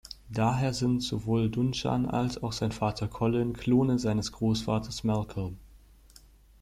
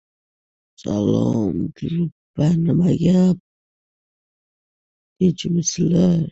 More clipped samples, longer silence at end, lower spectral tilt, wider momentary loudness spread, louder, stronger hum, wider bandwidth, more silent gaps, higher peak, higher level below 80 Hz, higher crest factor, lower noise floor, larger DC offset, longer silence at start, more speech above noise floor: neither; first, 0.85 s vs 0 s; about the same, -6.5 dB/octave vs -7 dB/octave; second, 6 LU vs 9 LU; second, -29 LUFS vs -19 LUFS; neither; first, 14.5 kHz vs 8 kHz; second, none vs 2.12-2.34 s, 3.40-5.16 s; second, -14 dBFS vs -4 dBFS; about the same, -50 dBFS vs -48 dBFS; about the same, 16 dB vs 16 dB; second, -56 dBFS vs under -90 dBFS; neither; second, 0.1 s vs 0.8 s; second, 28 dB vs over 72 dB